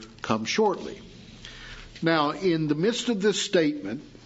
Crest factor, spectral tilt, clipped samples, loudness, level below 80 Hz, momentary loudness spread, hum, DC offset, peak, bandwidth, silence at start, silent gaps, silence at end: 20 dB; -4.5 dB/octave; under 0.1%; -25 LUFS; -56 dBFS; 19 LU; none; under 0.1%; -8 dBFS; 8 kHz; 0 s; none; 0 s